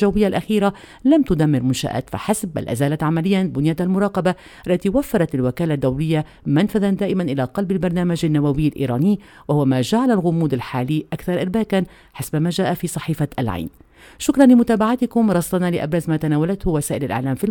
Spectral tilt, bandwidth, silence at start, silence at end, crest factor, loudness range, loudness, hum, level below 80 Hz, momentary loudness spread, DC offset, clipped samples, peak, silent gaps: -6.5 dB/octave; 18.5 kHz; 0 s; 0 s; 18 dB; 3 LU; -19 LUFS; none; -42 dBFS; 6 LU; under 0.1%; under 0.1%; 0 dBFS; none